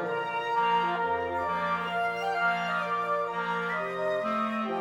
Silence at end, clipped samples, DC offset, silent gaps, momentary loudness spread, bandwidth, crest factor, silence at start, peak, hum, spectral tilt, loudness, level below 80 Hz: 0 s; under 0.1%; under 0.1%; none; 4 LU; 16.5 kHz; 14 dB; 0 s; -16 dBFS; none; -5.5 dB/octave; -29 LUFS; -66 dBFS